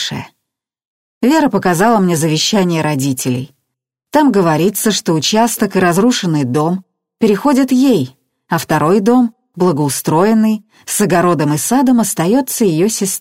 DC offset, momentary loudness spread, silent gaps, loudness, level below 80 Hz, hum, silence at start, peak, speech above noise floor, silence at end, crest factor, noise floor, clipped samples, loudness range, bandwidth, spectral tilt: under 0.1%; 7 LU; 0.85-1.21 s; -13 LUFS; -54 dBFS; none; 0 s; 0 dBFS; 63 dB; 0 s; 14 dB; -76 dBFS; under 0.1%; 1 LU; 16.5 kHz; -5 dB/octave